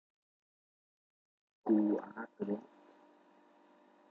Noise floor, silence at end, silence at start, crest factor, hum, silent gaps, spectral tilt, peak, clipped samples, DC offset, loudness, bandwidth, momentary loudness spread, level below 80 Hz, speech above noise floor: -66 dBFS; 1.45 s; 1.65 s; 20 dB; none; none; -10.5 dB/octave; -20 dBFS; under 0.1%; under 0.1%; -36 LUFS; 3.9 kHz; 13 LU; under -90 dBFS; 31 dB